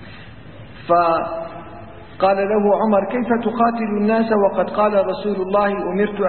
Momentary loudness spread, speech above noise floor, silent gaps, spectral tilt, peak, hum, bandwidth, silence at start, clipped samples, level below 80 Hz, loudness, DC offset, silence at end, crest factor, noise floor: 19 LU; 21 dB; none; -11.5 dB/octave; -4 dBFS; none; 4.4 kHz; 0 s; under 0.1%; -50 dBFS; -18 LUFS; 0.7%; 0 s; 16 dB; -39 dBFS